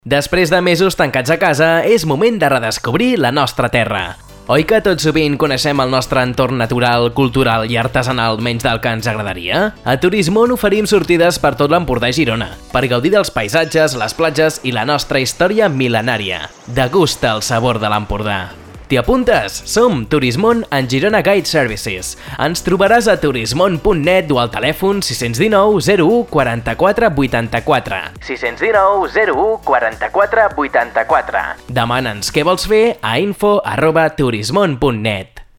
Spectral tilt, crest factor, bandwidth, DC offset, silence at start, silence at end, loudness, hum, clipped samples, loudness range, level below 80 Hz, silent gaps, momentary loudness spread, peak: -5 dB/octave; 14 dB; 18 kHz; under 0.1%; 0.05 s; 0.15 s; -14 LUFS; none; under 0.1%; 2 LU; -36 dBFS; none; 6 LU; 0 dBFS